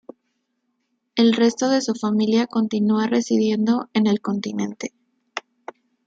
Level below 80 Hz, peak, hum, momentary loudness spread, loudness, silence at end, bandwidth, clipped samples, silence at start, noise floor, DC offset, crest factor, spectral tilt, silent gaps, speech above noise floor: -68 dBFS; -6 dBFS; none; 15 LU; -20 LUFS; 0.65 s; 7.8 kHz; under 0.1%; 1.15 s; -73 dBFS; under 0.1%; 16 dB; -5 dB/octave; none; 54 dB